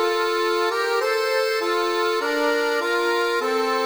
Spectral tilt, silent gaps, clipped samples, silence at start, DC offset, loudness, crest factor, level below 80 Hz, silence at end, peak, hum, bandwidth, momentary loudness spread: -0.5 dB/octave; none; under 0.1%; 0 s; 0.1%; -21 LUFS; 12 dB; -68 dBFS; 0 s; -10 dBFS; none; over 20 kHz; 1 LU